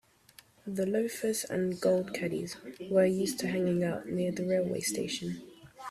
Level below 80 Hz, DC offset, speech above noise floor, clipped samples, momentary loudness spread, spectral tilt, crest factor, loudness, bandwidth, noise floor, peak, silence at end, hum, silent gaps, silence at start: -68 dBFS; under 0.1%; 29 dB; under 0.1%; 12 LU; -5 dB/octave; 18 dB; -31 LUFS; 15.5 kHz; -60 dBFS; -14 dBFS; 0 s; none; none; 0.65 s